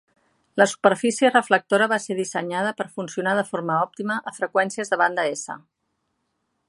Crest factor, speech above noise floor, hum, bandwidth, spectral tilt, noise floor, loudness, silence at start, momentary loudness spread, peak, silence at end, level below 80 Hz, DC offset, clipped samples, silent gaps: 22 dB; 52 dB; none; 11.5 kHz; -4 dB/octave; -75 dBFS; -22 LUFS; 0.55 s; 10 LU; -2 dBFS; 1.1 s; -74 dBFS; under 0.1%; under 0.1%; none